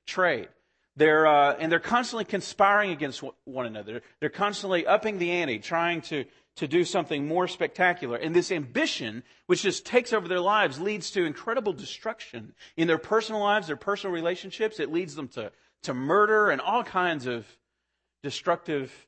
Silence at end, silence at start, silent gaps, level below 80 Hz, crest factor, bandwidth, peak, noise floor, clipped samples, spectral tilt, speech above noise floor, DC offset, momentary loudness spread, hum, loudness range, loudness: 0.1 s; 0.05 s; none; -70 dBFS; 20 dB; 8.8 kHz; -6 dBFS; -81 dBFS; under 0.1%; -4.5 dB/octave; 54 dB; under 0.1%; 15 LU; none; 4 LU; -26 LUFS